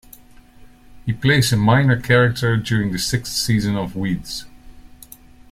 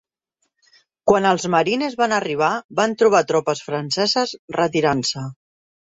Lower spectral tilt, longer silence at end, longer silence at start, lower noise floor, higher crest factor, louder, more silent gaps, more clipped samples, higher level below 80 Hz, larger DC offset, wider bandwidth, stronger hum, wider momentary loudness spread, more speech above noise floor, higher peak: about the same, -5 dB/octave vs -4 dB/octave; about the same, 0.7 s vs 0.65 s; second, 0.6 s vs 1.05 s; second, -45 dBFS vs -73 dBFS; about the same, 18 dB vs 18 dB; about the same, -18 LUFS vs -19 LUFS; second, none vs 2.64-2.69 s, 4.39-4.48 s; neither; first, -42 dBFS vs -58 dBFS; neither; first, 16 kHz vs 8 kHz; neither; first, 12 LU vs 8 LU; second, 27 dB vs 54 dB; about the same, -2 dBFS vs -2 dBFS